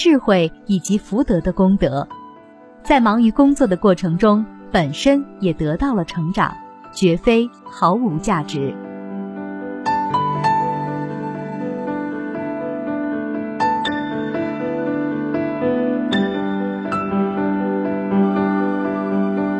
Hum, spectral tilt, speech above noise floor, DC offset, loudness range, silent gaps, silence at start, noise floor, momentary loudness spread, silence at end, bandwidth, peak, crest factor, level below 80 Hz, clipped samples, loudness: none; -6.5 dB/octave; 26 dB; under 0.1%; 6 LU; none; 0 s; -43 dBFS; 11 LU; 0 s; 11 kHz; -2 dBFS; 18 dB; -42 dBFS; under 0.1%; -19 LUFS